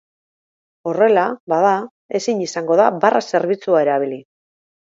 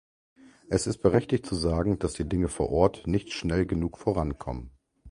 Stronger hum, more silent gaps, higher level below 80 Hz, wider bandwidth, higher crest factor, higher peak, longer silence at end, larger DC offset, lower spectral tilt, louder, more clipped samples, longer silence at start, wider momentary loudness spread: neither; first, 1.40-1.47 s, 1.91-2.09 s vs none; second, -74 dBFS vs -40 dBFS; second, 7.8 kHz vs 11.5 kHz; about the same, 18 dB vs 22 dB; first, 0 dBFS vs -6 dBFS; first, 0.65 s vs 0 s; neither; second, -5 dB/octave vs -6.5 dB/octave; first, -17 LUFS vs -28 LUFS; neither; first, 0.85 s vs 0.7 s; first, 11 LU vs 6 LU